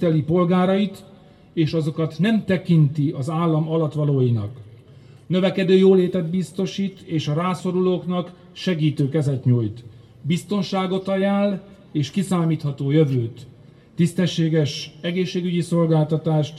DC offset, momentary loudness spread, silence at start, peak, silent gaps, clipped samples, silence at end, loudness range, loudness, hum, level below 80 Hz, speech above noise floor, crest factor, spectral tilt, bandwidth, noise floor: under 0.1%; 9 LU; 0 s; -4 dBFS; none; under 0.1%; 0 s; 3 LU; -21 LUFS; none; -60 dBFS; 26 dB; 16 dB; -7.5 dB/octave; 12 kHz; -46 dBFS